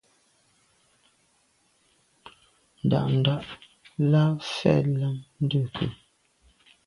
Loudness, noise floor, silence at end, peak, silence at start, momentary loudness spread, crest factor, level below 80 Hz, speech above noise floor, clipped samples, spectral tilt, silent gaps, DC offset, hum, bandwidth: -25 LUFS; -67 dBFS; 0.9 s; -6 dBFS; 2.25 s; 11 LU; 22 dB; -58 dBFS; 43 dB; under 0.1%; -7.5 dB/octave; none; under 0.1%; none; 11 kHz